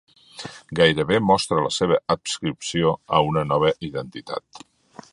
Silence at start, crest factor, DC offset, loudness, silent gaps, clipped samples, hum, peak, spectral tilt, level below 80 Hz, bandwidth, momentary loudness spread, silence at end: 0.35 s; 22 dB; under 0.1%; -21 LUFS; none; under 0.1%; none; 0 dBFS; -4.5 dB/octave; -52 dBFS; 11.5 kHz; 14 LU; 0.55 s